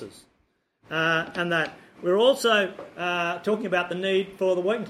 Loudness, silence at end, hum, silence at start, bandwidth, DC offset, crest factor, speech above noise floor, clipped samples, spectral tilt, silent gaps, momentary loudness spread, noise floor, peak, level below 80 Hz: -25 LUFS; 0 s; none; 0 s; 14.5 kHz; under 0.1%; 18 dB; 45 dB; under 0.1%; -4.5 dB/octave; none; 11 LU; -70 dBFS; -8 dBFS; -68 dBFS